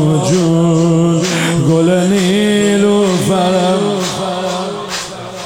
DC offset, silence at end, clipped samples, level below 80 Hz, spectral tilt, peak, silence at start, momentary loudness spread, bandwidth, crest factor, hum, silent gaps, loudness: 0.3%; 0 s; under 0.1%; -48 dBFS; -5.5 dB/octave; -2 dBFS; 0 s; 9 LU; 16.5 kHz; 12 dB; none; none; -13 LUFS